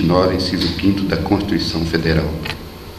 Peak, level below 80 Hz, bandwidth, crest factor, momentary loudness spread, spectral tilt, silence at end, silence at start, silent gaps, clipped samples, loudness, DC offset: 0 dBFS; -32 dBFS; 14 kHz; 18 dB; 9 LU; -6.5 dB/octave; 0 s; 0 s; none; under 0.1%; -18 LUFS; under 0.1%